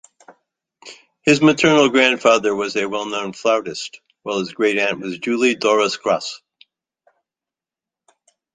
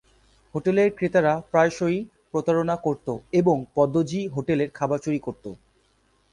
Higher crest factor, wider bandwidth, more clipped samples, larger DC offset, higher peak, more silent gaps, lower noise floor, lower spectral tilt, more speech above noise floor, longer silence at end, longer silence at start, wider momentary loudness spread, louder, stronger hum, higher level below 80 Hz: about the same, 20 dB vs 18 dB; second, 9.6 kHz vs 11 kHz; neither; neither; first, 0 dBFS vs -6 dBFS; neither; first, -89 dBFS vs -64 dBFS; second, -4 dB/octave vs -7 dB/octave; first, 71 dB vs 41 dB; first, 2.2 s vs 0.8 s; second, 0.3 s vs 0.55 s; first, 14 LU vs 9 LU; first, -17 LUFS vs -24 LUFS; neither; about the same, -62 dBFS vs -58 dBFS